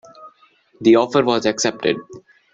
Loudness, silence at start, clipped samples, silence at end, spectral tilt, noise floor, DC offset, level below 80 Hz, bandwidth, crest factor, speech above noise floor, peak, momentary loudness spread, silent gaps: -18 LUFS; 0.2 s; under 0.1%; 0.35 s; -4 dB/octave; -55 dBFS; under 0.1%; -62 dBFS; 7.8 kHz; 18 dB; 38 dB; -2 dBFS; 8 LU; none